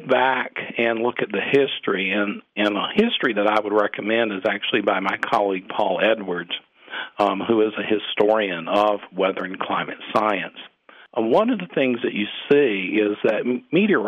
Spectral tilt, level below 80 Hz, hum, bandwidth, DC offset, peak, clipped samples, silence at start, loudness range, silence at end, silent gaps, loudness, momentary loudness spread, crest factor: -6.5 dB/octave; -68 dBFS; none; 8.6 kHz; under 0.1%; -6 dBFS; under 0.1%; 0 s; 2 LU; 0 s; none; -21 LUFS; 7 LU; 16 dB